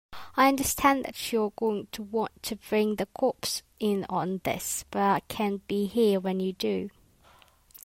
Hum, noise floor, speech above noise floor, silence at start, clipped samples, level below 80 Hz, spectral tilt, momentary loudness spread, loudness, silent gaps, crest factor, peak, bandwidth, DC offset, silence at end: none; -59 dBFS; 31 dB; 0.1 s; under 0.1%; -58 dBFS; -4 dB/octave; 8 LU; -28 LUFS; none; 20 dB; -8 dBFS; 16 kHz; under 0.1%; 0.1 s